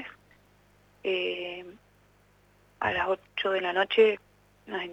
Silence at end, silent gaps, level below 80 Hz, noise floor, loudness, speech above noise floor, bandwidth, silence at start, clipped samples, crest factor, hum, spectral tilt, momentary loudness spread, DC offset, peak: 0 s; none; -64 dBFS; -62 dBFS; -28 LUFS; 35 dB; 8 kHz; 0 s; under 0.1%; 20 dB; 50 Hz at -65 dBFS; -5 dB/octave; 16 LU; under 0.1%; -10 dBFS